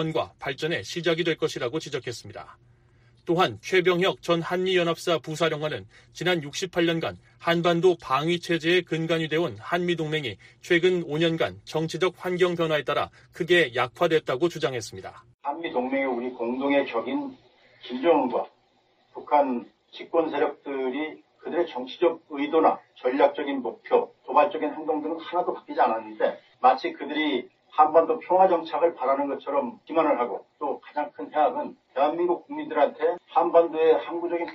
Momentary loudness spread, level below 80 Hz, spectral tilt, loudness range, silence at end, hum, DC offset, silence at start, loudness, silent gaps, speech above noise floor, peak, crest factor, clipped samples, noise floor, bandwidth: 11 LU; -66 dBFS; -5.5 dB/octave; 4 LU; 0 s; none; under 0.1%; 0 s; -25 LUFS; 15.34-15.39 s; 40 dB; -4 dBFS; 20 dB; under 0.1%; -65 dBFS; 15 kHz